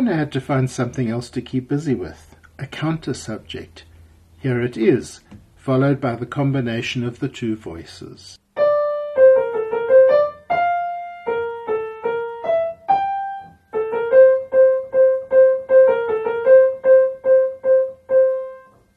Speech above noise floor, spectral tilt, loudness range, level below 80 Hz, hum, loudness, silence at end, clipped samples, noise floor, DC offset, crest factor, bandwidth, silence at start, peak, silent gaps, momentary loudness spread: 25 dB; -7 dB/octave; 9 LU; -54 dBFS; none; -18 LUFS; 0.4 s; under 0.1%; -48 dBFS; under 0.1%; 16 dB; 10 kHz; 0 s; -2 dBFS; none; 16 LU